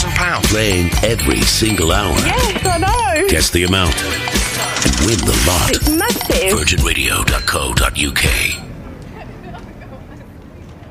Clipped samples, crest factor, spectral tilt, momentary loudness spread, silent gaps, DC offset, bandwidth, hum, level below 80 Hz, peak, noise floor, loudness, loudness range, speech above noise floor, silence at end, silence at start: under 0.1%; 14 dB; -3.5 dB/octave; 20 LU; none; under 0.1%; 16 kHz; none; -24 dBFS; -2 dBFS; -35 dBFS; -14 LUFS; 4 LU; 21 dB; 0 s; 0 s